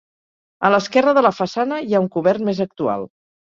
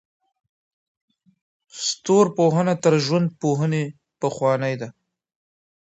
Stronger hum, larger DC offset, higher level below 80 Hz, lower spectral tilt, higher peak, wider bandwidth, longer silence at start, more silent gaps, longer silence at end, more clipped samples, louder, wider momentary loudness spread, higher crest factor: neither; neither; first, -62 dBFS vs -68 dBFS; about the same, -6 dB/octave vs -5.5 dB/octave; about the same, -2 dBFS vs -4 dBFS; about the same, 7.6 kHz vs 8.2 kHz; second, 0.6 s vs 1.75 s; neither; second, 0.35 s vs 0.95 s; neither; first, -18 LUFS vs -21 LUFS; second, 8 LU vs 12 LU; about the same, 18 dB vs 20 dB